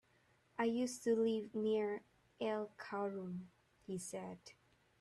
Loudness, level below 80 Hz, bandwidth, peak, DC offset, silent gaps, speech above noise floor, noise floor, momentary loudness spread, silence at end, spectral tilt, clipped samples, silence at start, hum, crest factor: -41 LUFS; -82 dBFS; 13 kHz; -26 dBFS; under 0.1%; none; 34 dB; -74 dBFS; 16 LU; 0.5 s; -5 dB/octave; under 0.1%; 0.6 s; none; 16 dB